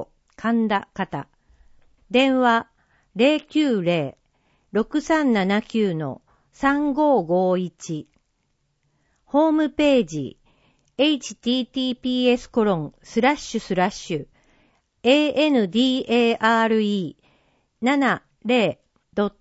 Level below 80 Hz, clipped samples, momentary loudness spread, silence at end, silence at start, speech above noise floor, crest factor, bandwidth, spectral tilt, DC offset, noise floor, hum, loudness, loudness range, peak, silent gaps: -56 dBFS; under 0.1%; 12 LU; 0.1 s; 0 s; 50 dB; 18 dB; 8 kHz; -5.5 dB/octave; under 0.1%; -70 dBFS; none; -21 LUFS; 3 LU; -4 dBFS; none